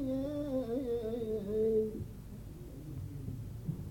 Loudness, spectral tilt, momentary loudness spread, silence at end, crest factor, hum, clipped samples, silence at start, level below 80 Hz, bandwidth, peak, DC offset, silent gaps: -37 LUFS; -8.5 dB/octave; 16 LU; 0 s; 14 dB; none; under 0.1%; 0 s; -52 dBFS; 17 kHz; -22 dBFS; under 0.1%; none